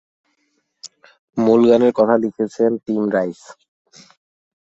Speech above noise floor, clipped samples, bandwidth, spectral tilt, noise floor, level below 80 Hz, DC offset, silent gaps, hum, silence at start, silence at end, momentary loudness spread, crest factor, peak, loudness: 52 dB; under 0.1%; 8 kHz; -7 dB/octave; -68 dBFS; -60 dBFS; under 0.1%; 1.19-1.28 s; none; 0.85 s; 1.15 s; 26 LU; 18 dB; -2 dBFS; -17 LUFS